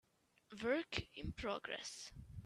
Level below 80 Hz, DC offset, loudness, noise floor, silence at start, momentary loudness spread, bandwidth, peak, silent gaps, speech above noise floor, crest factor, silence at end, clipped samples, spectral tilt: -60 dBFS; under 0.1%; -44 LUFS; -69 dBFS; 0.5 s; 12 LU; 13.5 kHz; -20 dBFS; none; 25 dB; 24 dB; 0 s; under 0.1%; -4 dB/octave